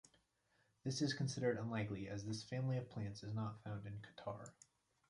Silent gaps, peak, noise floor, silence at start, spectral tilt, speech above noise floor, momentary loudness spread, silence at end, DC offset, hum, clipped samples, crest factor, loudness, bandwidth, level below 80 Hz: none; -26 dBFS; -80 dBFS; 0.85 s; -5.5 dB/octave; 36 dB; 10 LU; 0.6 s; under 0.1%; none; under 0.1%; 18 dB; -44 LUFS; 11.5 kHz; -72 dBFS